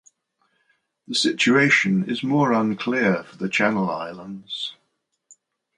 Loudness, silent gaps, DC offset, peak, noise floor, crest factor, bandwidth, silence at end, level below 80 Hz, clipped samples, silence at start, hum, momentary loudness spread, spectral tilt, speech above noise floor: -21 LUFS; none; under 0.1%; -4 dBFS; -74 dBFS; 20 dB; 11 kHz; 1.05 s; -66 dBFS; under 0.1%; 1.1 s; none; 14 LU; -4.5 dB/octave; 52 dB